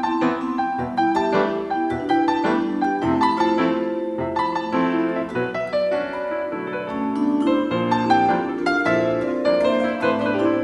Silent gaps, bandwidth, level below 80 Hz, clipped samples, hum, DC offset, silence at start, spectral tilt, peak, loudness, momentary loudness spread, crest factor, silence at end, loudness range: none; 10.5 kHz; -54 dBFS; under 0.1%; none; under 0.1%; 0 s; -6.5 dB/octave; -4 dBFS; -21 LUFS; 6 LU; 16 dB; 0 s; 3 LU